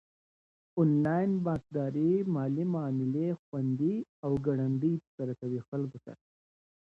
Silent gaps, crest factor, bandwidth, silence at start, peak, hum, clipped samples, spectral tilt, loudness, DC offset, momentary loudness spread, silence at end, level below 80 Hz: 3.39-3.52 s, 4.09-4.23 s, 5.07-5.18 s, 5.68-5.72 s; 16 dB; 6.8 kHz; 0.75 s; -16 dBFS; none; under 0.1%; -11 dB/octave; -31 LUFS; under 0.1%; 9 LU; 0.7 s; -66 dBFS